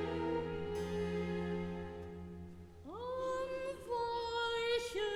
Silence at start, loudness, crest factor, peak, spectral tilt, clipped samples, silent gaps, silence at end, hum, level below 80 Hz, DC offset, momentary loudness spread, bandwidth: 0 s; -39 LUFS; 14 dB; -24 dBFS; -5.5 dB/octave; under 0.1%; none; 0 s; none; -58 dBFS; under 0.1%; 13 LU; 15 kHz